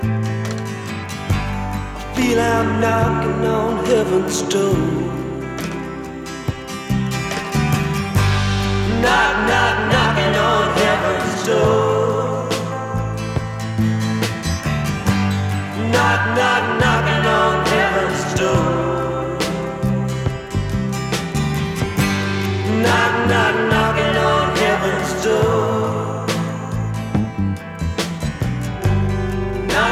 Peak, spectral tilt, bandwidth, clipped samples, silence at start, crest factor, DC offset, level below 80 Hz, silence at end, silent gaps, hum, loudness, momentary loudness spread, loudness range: -2 dBFS; -5.5 dB/octave; 16 kHz; under 0.1%; 0 s; 16 dB; under 0.1%; -34 dBFS; 0 s; none; none; -18 LUFS; 9 LU; 5 LU